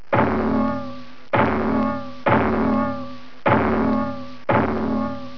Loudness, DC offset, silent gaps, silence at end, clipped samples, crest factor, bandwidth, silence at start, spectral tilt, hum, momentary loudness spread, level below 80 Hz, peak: -21 LUFS; 2%; none; 0 s; under 0.1%; 16 dB; 5.4 kHz; 0.1 s; -9 dB/octave; none; 11 LU; -42 dBFS; -4 dBFS